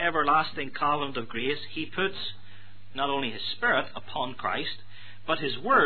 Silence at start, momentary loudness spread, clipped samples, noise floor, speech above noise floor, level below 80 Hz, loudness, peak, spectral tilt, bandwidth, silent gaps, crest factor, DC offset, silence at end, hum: 0 s; 13 LU; under 0.1%; -52 dBFS; 24 dB; -60 dBFS; -29 LUFS; -10 dBFS; -7 dB/octave; 4.6 kHz; none; 20 dB; 2%; 0 s; none